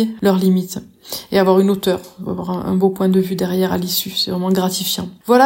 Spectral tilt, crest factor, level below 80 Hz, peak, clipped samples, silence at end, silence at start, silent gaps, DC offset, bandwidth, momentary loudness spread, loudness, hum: -5.5 dB/octave; 16 dB; -52 dBFS; 0 dBFS; under 0.1%; 0 s; 0 s; none; under 0.1%; 16.5 kHz; 11 LU; -17 LUFS; none